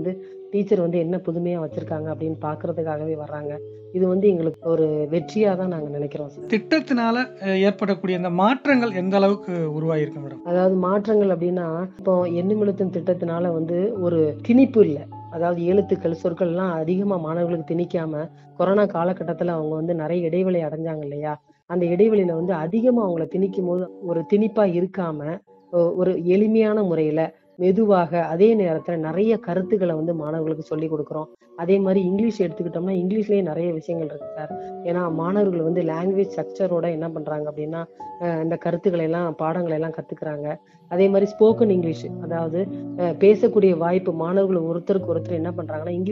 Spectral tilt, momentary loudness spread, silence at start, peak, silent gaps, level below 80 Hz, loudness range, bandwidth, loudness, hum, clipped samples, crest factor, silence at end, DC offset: -9 dB/octave; 11 LU; 0 s; -2 dBFS; none; -66 dBFS; 4 LU; 7 kHz; -22 LUFS; none; under 0.1%; 18 dB; 0 s; under 0.1%